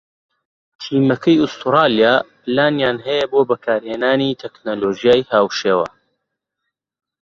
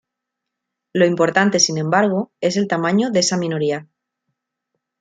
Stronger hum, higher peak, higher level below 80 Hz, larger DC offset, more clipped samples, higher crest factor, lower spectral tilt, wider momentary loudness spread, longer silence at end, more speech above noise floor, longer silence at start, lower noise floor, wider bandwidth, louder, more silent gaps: neither; about the same, -2 dBFS vs -2 dBFS; first, -58 dBFS vs -66 dBFS; neither; neither; about the same, 16 dB vs 18 dB; first, -6 dB/octave vs -4 dB/octave; about the same, 8 LU vs 7 LU; first, 1.4 s vs 1.15 s; about the same, 62 dB vs 64 dB; second, 0.8 s vs 0.95 s; about the same, -78 dBFS vs -81 dBFS; second, 7.4 kHz vs 9.4 kHz; about the same, -17 LUFS vs -18 LUFS; neither